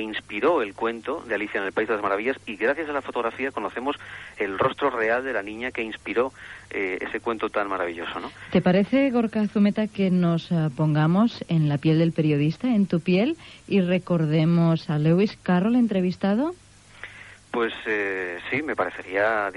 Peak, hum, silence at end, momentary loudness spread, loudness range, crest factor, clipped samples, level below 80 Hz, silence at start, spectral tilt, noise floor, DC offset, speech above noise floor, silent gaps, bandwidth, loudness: -10 dBFS; none; 0 s; 10 LU; 5 LU; 14 dB; under 0.1%; -58 dBFS; 0 s; -8 dB/octave; -44 dBFS; under 0.1%; 21 dB; none; 11 kHz; -24 LUFS